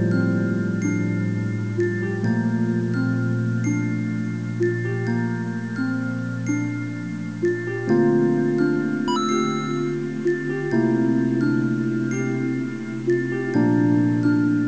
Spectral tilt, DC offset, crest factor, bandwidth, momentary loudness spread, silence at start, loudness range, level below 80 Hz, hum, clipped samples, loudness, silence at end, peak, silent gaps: -7.5 dB/octave; 0.4%; 14 dB; 8 kHz; 7 LU; 0 s; 3 LU; -58 dBFS; none; under 0.1%; -23 LUFS; 0 s; -8 dBFS; none